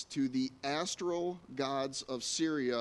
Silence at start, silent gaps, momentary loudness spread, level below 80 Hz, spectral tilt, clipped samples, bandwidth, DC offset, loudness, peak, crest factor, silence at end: 0 s; none; 5 LU; -72 dBFS; -3.5 dB/octave; under 0.1%; 11.5 kHz; under 0.1%; -35 LUFS; -20 dBFS; 14 dB; 0 s